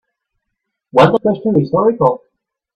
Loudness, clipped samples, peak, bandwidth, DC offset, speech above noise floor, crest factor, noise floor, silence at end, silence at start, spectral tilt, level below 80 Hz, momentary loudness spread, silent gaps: -14 LUFS; under 0.1%; 0 dBFS; 8.4 kHz; under 0.1%; 63 dB; 16 dB; -75 dBFS; 0.6 s; 0.95 s; -8 dB/octave; -52 dBFS; 6 LU; none